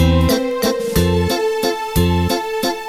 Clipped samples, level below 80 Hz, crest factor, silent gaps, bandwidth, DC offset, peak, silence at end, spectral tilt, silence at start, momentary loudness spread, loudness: under 0.1%; -28 dBFS; 14 dB; none; 16 kHz; under 0.1%; -2 dBFS; 0 s; -5.5 dB/octave; 0 s; 4 LU; -17 LUFS